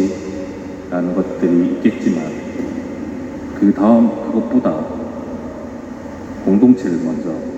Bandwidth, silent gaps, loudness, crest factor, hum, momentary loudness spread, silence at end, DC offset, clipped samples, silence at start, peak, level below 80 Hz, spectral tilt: 8 kHz; none; -17 LUFS; 18 dB; none; 17 LU; 0 s; under 0.1%; under 0.1%; 0 s; 0 dBFS; -46 dBFS; -8 dB/octave